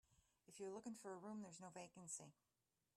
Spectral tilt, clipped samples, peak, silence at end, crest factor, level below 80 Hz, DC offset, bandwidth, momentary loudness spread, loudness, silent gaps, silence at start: -4 dB/octave; under 0.1%; -38 dBFS; 0.65 s; 18 dB; under -90 dBFS; under 0.1%; 14 kHz; 5 LU; -55 LUFS; none; 0.1 s